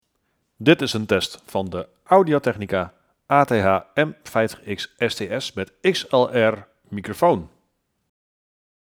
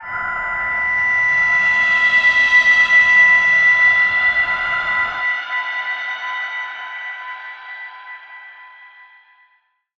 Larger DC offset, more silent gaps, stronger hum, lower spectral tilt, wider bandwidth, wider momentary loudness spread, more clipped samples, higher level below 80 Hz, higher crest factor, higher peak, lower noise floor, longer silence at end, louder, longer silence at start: neither; neither; neither; first, -5.5 dB/octave vs -1 dB/octave; first, 20 kHz vs 7.8 kHz; second, 13 LU vs 21 LU; neither; second, -58 dBFS vs -52 dBFS; first, 22 dB vs 14 dB; first, 0 dBFS vs -4 dBFS; first, -71 dBFS vs -62 dBFS; first, 1.5 s vs 1.15 s; second, -21 LUFS vs -13 LUFS; first, 0.6 s vs 0 s